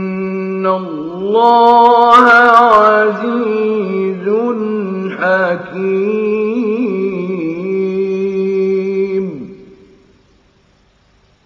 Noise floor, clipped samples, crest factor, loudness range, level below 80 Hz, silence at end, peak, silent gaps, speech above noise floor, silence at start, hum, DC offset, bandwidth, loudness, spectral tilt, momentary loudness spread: -52 dBFS; 0.3%; 14 dB; 10 LU; -56 dBFS; 1.8 s; 0 dBFS; none; 42 dB; 0 s; none; under 0.1%; 9 kHz; -12 LUFS; -7 dB/octave; 13 LU